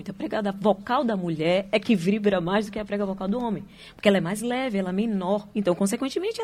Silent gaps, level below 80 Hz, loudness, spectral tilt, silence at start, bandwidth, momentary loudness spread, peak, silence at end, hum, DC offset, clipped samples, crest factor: none; -56 dBFS; -25 LUFS; -6 dB/octave; 0 s; 15 kHz; 6 LU; -6 dBFS; 0 s; none; under 0.1%; under 0.1%; 18 dB